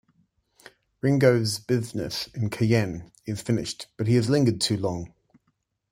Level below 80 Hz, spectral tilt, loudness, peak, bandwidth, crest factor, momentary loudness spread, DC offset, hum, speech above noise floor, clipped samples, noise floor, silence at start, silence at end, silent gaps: -56 dBFS; -6 dB/octave; -25 LUFS; -6 dBFS; 16 kHz; 20 dB; 13 LU; under 0.1%; none; 50 dB; under 0.1%; -74 dBFS; 1.05 s; 0.85 s; none